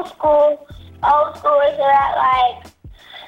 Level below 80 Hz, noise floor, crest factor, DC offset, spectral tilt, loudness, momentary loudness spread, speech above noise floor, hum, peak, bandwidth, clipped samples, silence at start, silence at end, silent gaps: -46 dBFS; -39 dBFS; 12 dB; under 0.1%; -5 dB/octave; -16 LUFS; 5 LU; 23 dB; none; -6 dBFS; 7.6 kHz; under 0.1%; 0 s; 0 s; none